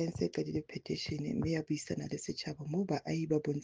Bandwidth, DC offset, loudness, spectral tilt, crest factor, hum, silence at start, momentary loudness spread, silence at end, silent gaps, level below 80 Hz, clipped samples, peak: 9.8 kHz; under 0.1%; -37 LUFS; -6 dB/octave; 16 dB; none; 0 s; 6 LU; 0 s; none; -60 dBFS; under 0.1%; -20 dBFS